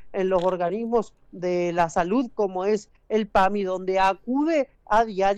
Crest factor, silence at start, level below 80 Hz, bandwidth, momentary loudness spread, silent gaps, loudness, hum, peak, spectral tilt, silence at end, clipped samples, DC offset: 14 dB; 0 s; -48 dBFS; 10 kHz; 6 LU; none; -24 LUFS; none; -10 dBFS; -6 dB/octave; 0 s; under 0.1%; under 0.1%